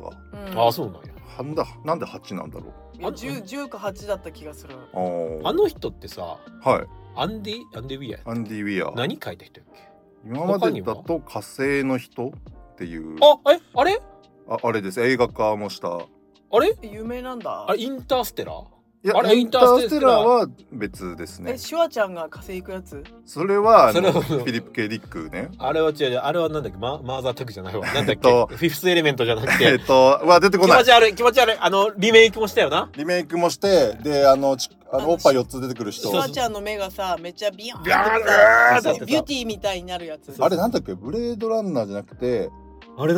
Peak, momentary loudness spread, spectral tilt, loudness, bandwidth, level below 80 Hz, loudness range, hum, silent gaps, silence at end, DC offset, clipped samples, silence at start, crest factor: 0 dBFS; 19 LU; -4.5 dB/octave; -20 LUFS; 17.5 kHz; -50 dBFS; 13 LU; none; none; 0 s; under 0.1%; under 0.1%; 0 s; 20 dB